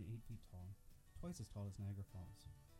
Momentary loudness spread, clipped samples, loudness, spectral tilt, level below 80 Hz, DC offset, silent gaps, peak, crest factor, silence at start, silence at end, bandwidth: 11 LU; under 0.1%; -54 LUFS; -6.5 dB/octave; -62 dBFS; under 0.1%; none; -40 dBFS; 14 dB; 0 s; 0 s; 16 kHz